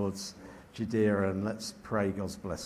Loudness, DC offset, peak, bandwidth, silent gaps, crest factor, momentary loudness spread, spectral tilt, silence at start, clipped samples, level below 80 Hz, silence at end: -33 LUFS; under 0.1%; -16 dBFS; 15 kHz; none; 16 dB; 14 LU; -5.5 dB/octave; 0 s; under 0.1%; -54 dBFS; 0 s